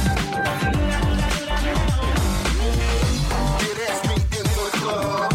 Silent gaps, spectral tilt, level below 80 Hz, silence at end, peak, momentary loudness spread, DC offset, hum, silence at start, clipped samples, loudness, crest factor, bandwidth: none; -5 dB/octave; -24 dBFS; 0 s; -8 dBFS; 2 LU; under 0.1%; none; 0 s; under 0.1%; -22 LUFS; 12 dB; 16.5 kHz